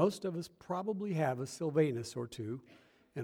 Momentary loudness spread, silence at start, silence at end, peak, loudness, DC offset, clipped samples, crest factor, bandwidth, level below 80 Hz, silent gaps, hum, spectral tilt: 11 LU; 0 s; 0 s; -16 dBFS; -37 LUFS; under 0.1%; under 0.1%; 20 dB; 17 kHz; -76 dBFS; none; none; -6.5 dB/octave